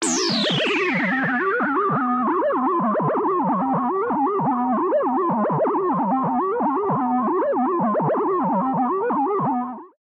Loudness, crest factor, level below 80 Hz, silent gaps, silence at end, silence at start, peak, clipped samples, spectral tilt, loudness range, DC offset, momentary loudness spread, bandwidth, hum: -21 LUFS; 12 dB; -68 dBFS; none; 0.15 s; 0 s; -10 dBFS; under 0.1%; -4.5 dB/octave; 1 LU; under 0.1%; 2 LU; 10.5 kHz; none